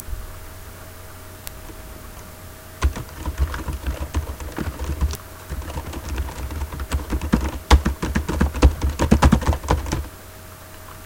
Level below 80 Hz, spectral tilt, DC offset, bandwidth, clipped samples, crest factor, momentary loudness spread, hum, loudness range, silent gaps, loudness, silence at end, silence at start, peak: -26 dBFS; -6 dB/octave; under 0.1%; 17 kHz; under 0.1%; 22 dB; 21 LU; none; 10 LU; none; -23 LUFS; 0 s; 0 s; 0 dBFS